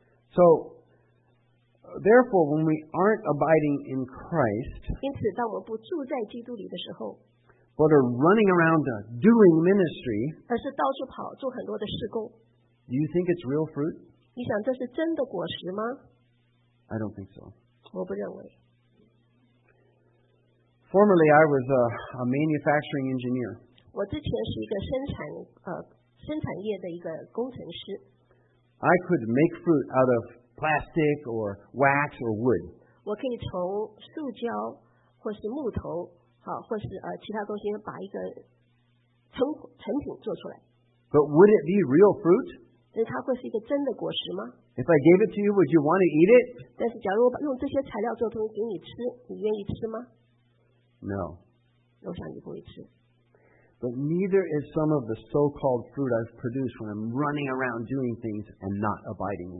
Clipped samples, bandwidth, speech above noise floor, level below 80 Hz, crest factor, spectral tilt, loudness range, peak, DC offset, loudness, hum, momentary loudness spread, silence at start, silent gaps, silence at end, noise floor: under 0.1%; 4 kHz; 41 dB; -56 dBFS; 22 dB; -11.5 dB/octave; 14 LU; -6 dBFS; under 0.1%; -26 LUFS; none; 18 LU; 0.35 s; none; 0 s; -66 dBFS